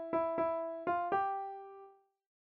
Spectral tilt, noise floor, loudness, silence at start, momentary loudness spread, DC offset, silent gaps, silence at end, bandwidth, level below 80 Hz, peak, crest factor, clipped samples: -4.5 dB/octave; -59 dBFS; -36 LUFS; 0 s; 17 LU; under 0.1%; none; 0.55 s; 5.2 kHz; -76 dBFS; -22 dBFS; 16 dB; under 0.1%